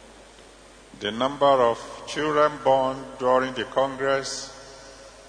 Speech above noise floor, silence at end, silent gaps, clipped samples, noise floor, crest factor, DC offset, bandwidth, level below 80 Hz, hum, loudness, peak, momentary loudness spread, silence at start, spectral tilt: 26 dB; 0 s; none; under 0.1%; -49 dBFS; 18 dB; under 0.1%; 10.5 kHz; -56 dBFS; none; -24 LUFS; -6 dBFS; 18 LU; 0.1 s; -4 dB/octave